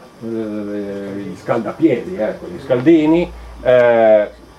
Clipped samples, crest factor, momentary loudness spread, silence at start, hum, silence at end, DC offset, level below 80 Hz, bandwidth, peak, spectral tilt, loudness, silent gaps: under 0.1%; 16 dB; 14 LU; 0 s; none; 0.25 s; under 0.1%; -44 dBFS; 11 kHz; 0 dBFS; -7.5 dB/octave; -16 LUFS; none